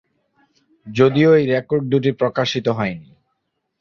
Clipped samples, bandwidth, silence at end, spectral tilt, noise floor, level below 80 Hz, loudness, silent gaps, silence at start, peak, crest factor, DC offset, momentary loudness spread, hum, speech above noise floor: under 0.1%; 7.2 kHz; 0.8 s; -7 dB/octave; -73 dBFS; -56 dBFS; -18 LUFS; none; 0.85 s; -2 dBFS; 18 dB; under 0.1%; 11 LU; none; 56 dB